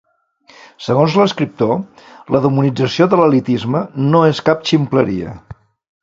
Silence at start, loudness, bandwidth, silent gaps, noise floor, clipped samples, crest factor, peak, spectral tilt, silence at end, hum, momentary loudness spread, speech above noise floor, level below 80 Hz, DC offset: 0.8 s; -15 LUFS; 7.8 kHz; none; -51 dBFS; under 0.1%; 16 dB; 0 dBFS; -7 dB/octave; 0.5 s; none; 10 LU; 36 dB; -50 dBFS; under 0.1%